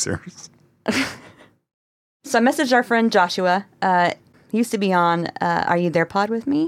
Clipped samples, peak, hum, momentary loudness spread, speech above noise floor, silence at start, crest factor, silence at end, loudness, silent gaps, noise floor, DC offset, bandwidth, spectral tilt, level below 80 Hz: under 0.1%; -2 dBFS; none; 10 LU; 29 dB; 0 s; 18 dB; 0 s; -20 LUFS; 1.74-2.20 s; -48 dBFS; under 0.1%; 16 kHz; -4.5 dB/octave; -62 dBFS